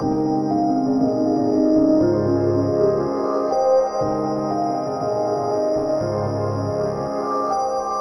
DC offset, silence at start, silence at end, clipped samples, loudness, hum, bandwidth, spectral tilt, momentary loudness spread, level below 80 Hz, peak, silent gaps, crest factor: under 0.1%; 0 s; 0 s; under 0.1%; -20 LUFS; none; 11.5 kHz; -8 dB/octave; 6 LU; -50 dBFS; -6 dBFS; none; 12 dB